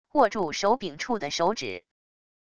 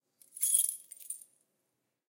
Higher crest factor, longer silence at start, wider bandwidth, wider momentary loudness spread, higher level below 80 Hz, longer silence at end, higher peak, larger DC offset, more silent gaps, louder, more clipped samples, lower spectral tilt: about the same, 20 dB vs 24 dB; second, 0.05 s vs 0.35 s; second, 11 kHz vs 17 kHz; second, 10 LU vs 18 LU; first, -62 dBFS vs under -90 dBFS; second, 0.65 s vs 0.95 s; first, -8 dBFS vs -12 dBFS; neither; neither; about the same, -27 LUFS vs -29 LUFS; neither; first, -3.5 dB/octave vs 5 dB/octave